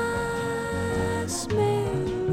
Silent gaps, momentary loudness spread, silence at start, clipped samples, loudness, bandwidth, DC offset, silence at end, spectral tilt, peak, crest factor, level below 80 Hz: none; 4 LU; 0 s; under 0.1%; -27 LUFS; 16 kHz; under 0.1%; 0 s; -5.5 dB/octave; -12 dBFS; 14 dB; -44 dBFS